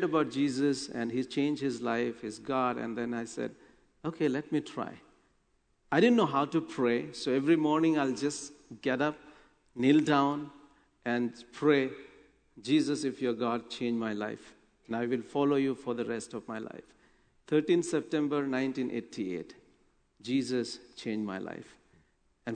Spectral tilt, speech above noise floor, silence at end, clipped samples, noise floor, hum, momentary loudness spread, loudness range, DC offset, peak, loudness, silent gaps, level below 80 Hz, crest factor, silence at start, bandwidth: -5.5 dB/octave; 42 dB; 0 s; under 0.1%; -72 dBFS; none; 14 LU; 6 LU; under 0.1%; -12 dBFS; -31 LUFS; none; -70 dBFS; 20 dB; 0 s; 9.4 kHz